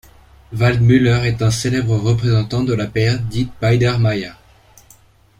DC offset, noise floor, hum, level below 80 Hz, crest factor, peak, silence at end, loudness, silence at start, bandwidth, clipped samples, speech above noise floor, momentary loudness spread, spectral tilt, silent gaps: under 0.1%; -49 dBFS; none; -38 dBFS; 14 dB; -2 dBFS; 1.05 s; -16 LUFS; 0.5 s; 11.5 kHz; under 0.1%; 34 dB; 7 LU; -6.5 dB/octave; none